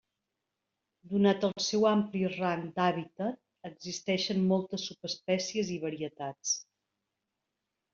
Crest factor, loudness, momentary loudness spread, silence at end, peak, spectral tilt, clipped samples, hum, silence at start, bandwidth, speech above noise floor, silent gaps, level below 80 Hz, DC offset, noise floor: 20 dB; -31 LUFS; 11 LU; 1.3 s; -14 dBFS; -4.5 dB/octave; under 0.1%; none; 1.05 s; 7.6 kHz; 55 dB; none; -72 dBFS; under 0.1%; -86 dBFS